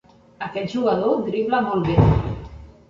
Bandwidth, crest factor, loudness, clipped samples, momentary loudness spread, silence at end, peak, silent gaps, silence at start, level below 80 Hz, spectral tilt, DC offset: 7.4 kHz; 18 dB; -21 LUFS; under 0.1%; 15 LU; 0.2 s; -2 dBFS; none; 0.4 s; -34 dBFS; -8.5 dB/octave; under 0.1%